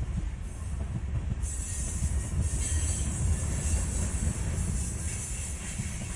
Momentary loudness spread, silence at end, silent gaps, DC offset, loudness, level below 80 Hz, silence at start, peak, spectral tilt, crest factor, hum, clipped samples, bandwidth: 6 LU; 0 s; none; under 0.1%; -32 LUFS; -34 dBFS; 0 s; -16 dBFS; -4.5 dB/octave; 14 dB; none; under 0.1%; 11.5 kHz